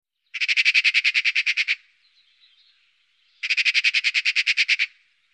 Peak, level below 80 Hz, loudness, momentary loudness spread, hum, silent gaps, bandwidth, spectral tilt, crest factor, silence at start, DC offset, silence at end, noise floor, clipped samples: -8 dBFS; -88 dBFS; -19 LUFS; 10 LU; none; none; 10.5 kHz; 8.5 dB/octave; 16 dB; 0.35 s; under 0.1%; 0.45 s; -64 dBFS; under 0.1%